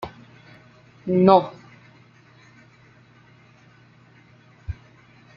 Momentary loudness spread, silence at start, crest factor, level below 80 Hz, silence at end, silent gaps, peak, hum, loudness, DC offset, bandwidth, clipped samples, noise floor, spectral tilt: 24 LU; 0 s; 24 dB; -52 dBFS; 0.65 s; none; -2 dBFS; none; -19 LUFS; under 0.1%; 6.4 kHz; under 0.1%; -53 dBFS; -7 dB/octave